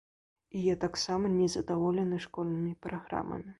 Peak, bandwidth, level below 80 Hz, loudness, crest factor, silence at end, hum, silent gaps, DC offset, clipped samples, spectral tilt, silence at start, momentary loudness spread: -18 dBFS; 11.5 kHz; -60 dBFS; -32 LUFS; 14 dB; 0.05 s; none; none; under 0.1%; under 0.1%; -6 dB/octave; 0.55 s; 7 LU